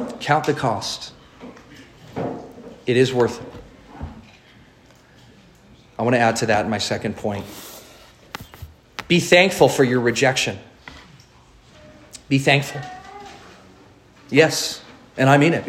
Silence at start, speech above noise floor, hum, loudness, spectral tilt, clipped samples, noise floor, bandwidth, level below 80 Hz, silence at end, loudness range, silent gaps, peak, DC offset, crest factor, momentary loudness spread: 0 s; 32 dB; none; -19 LUFS; -4.5 dB/octave; under 0.1%; -50 dBFS; 16 kHz; -54 dBFS; 0 s; 6 LU; none; 0 dBFS; under 0.1%; 22 dB; 25 LU